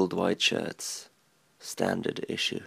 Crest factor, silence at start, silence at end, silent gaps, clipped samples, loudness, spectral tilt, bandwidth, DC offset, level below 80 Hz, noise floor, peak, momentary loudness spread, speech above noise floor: 20 dB; 0 s; 0 s; none; under 0.1%; -29 LUFS; -3.5 dB/octave; 15.5 kHz; under 0.1%; -72 dBFS; -67 dBFS; -10 dBFS; 15 LU; 36 dB